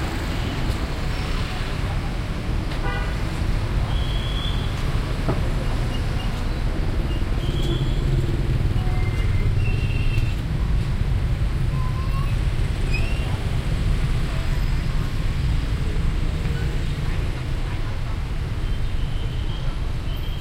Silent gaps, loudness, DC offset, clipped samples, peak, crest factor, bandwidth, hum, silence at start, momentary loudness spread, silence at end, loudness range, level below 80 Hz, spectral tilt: none; -25 LUFS; under 0.1%; under 0.1%; -6 dBFS; 14 dB; 15 kHz; none; 0 s; 5 LU; 0 s; 3 LU; -24 dBFS; -6.5 dB/octave